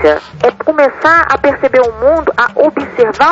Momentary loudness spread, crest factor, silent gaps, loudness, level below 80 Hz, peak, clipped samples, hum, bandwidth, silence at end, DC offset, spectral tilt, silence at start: 5 LU; 10 dB; none; -11 LUFS; -38 dBFS; 0 dBFS; 0.1%; none; 7.8 kHz; 0 s; under 0.1%; -5.5 dB/octave; 0 s